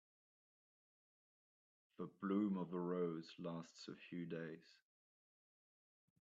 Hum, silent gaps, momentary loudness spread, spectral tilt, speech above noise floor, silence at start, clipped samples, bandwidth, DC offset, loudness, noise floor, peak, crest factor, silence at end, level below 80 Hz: none; none; 14 LU; -7 dB/octave; over 45 dB; 2 s; under 0.1%; 7.6 kHz; under 0.1%; -46 LUFS; under -90 dBFS; -28 dBFS; 20 dB; 1.65 s; under -90 dBFS